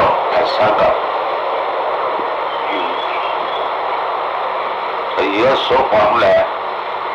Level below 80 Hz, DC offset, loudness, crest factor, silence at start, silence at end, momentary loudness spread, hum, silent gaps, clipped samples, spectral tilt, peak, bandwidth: -50 dBFS; under 0.1%; -16 LUFS; 12 dB; 0 s; 0 s; 7 LU; none; none; under 0.1%; -5 dB/octave; -6 dBFS; 8 kHz